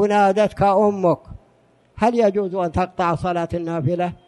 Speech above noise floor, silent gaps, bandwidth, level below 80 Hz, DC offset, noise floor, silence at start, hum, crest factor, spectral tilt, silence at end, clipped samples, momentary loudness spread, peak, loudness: 38 dB; none; 11.5 kHz; -46 dBFS; under 0.1%; -57 dBFS; 0 s; none; 14 dB; -7.5 dB/octave; 0.15 s; under 0.1%; 7 LU; -6 dBFS; -20 LUFS